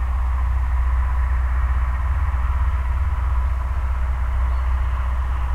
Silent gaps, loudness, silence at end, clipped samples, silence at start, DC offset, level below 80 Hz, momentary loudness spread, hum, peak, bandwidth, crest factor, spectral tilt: none; -23 LUFS; 0 s; under 0.1%; 0 s; under 0.1%; -20 dBFS; 2 LU; none; -10 dBFS; 3.4 kHz; 10 dB; -7.5 dB/octave